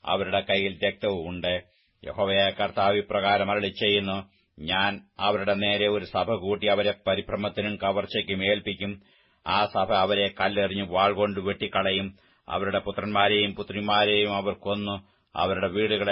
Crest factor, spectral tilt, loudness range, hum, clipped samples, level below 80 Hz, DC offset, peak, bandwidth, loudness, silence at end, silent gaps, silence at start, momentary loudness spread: 20 dB; -9 dB/octave; 2 LU; none; under 0.1%; -56 dBFS; under 0.1%; -6 dBFS; 5.8 kHz; -25 LUFS; 0 s; none; 0.05 s; 9 LU